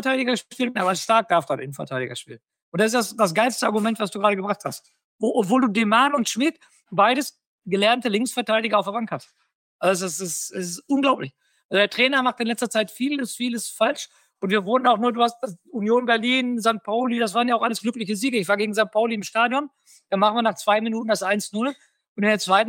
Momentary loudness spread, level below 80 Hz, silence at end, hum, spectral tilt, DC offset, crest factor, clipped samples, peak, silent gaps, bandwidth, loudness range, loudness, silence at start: 10 LU; -76 dBFS; 0 s; none; -3.5 dB/octave; under 0.1%; 18 dB; under 0.1%; -4 dBFS; 2.62-2.72 s, 5.04-5.19 s, 7.47-7.58 s, 9.55-9.79 s, 11.64-11.69 s, 22.09-22.16 s; 17 kHz; 2 LU; -22 LUFS; 0 s